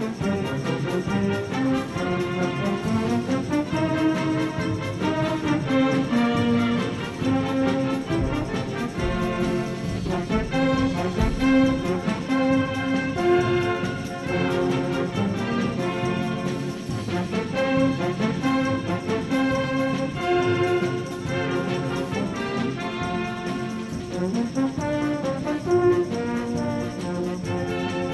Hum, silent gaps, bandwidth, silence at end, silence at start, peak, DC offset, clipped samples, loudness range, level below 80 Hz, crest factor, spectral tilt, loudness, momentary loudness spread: none; none; 12.5 kHz; 0 s; 0 s; -8 dBFS; under 0.1%; under 0.1%; 3 LU; -42 dBFS; 16 dB; -6.5 dB/octave; -24 LUFS; 6 LU